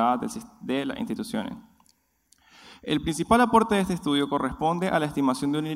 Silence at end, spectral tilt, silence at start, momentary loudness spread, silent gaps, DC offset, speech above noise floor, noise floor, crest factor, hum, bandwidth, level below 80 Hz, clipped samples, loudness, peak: 0 s; -5.5 dB/octave; 0 s; 14 LU; none; under 0.1%; 41 dB; -66 dBFS; 20 dB; none; 15.5 kHz; -52 dBFS; under 0.1%; -25 LUFS; -6 dBFS